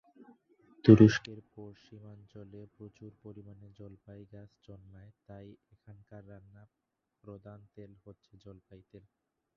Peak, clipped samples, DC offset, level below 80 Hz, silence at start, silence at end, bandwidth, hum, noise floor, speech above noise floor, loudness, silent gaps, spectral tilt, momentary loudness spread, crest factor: -6 dBFS; under 0.1%; under 0.1%; -60 dBFS; 0.85 s; 8.4 s; 6.8 kHz; none; -65 dBFS; 33 dB; -23 LUFS; none; -8 dB/octave; 31 LU; 28 dB